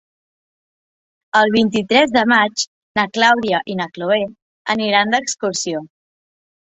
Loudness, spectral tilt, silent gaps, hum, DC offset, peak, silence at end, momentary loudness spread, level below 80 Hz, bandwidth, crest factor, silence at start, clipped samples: -16 LUFS; -3 dB/octave; 2.67-2.95 s, 4.42-4.65 s; none; under 0.1%; 0 dBFS; 0.8 s; 10 LU; -60 dBFS; 8.4 kHz; 18 dB; 1.35 s; under 0.1%